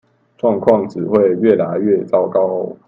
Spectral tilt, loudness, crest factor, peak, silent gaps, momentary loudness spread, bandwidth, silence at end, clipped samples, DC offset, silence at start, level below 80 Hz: -9.5 dB/octave; -15 LUFS; 16 dB; 0 dBFS; none; 5 LU; 7.2 kHz; 0.15 s; under 0.1%; under 0.1%; 0.45 s; -58 dBFS